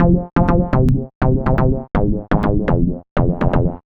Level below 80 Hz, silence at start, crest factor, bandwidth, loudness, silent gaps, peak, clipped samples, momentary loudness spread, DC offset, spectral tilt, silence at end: -22 dBFS; 0 s; 16 dB; 5 kHz; -17 LUFS; 1.15-1.21 s, 3.11-3.16 s; 0 dBFS; under 0.1%; 4 LU; under 0.1%; -10.5 dB/octave; 0.1 s